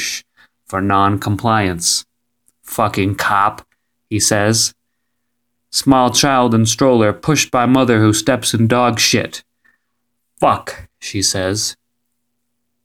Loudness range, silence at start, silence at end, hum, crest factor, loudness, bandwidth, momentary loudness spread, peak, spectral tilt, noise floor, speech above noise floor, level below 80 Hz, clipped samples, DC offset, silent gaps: 5 LU; 0 s; 1.1 s; none; 16 dB; -15 LUFS; 18 kHz; 10 LU; 0 dBFS; -4 dB/octave; -73 dBFS; 59 dB; -50 dBFS; under 0.1%; under 0.1%; none